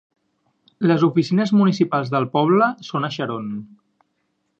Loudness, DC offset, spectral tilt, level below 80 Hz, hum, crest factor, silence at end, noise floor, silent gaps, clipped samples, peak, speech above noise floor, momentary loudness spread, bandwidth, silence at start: -19 LUFS; under 0.1%; -7.5 dB/octave; -68 dBFS; none; 18 dB; 0.95 s; -71 dBFS; none; under 0.1%; -2 dBFS; 52 dB; 10 LU; 7.4 kHz; 0.8 s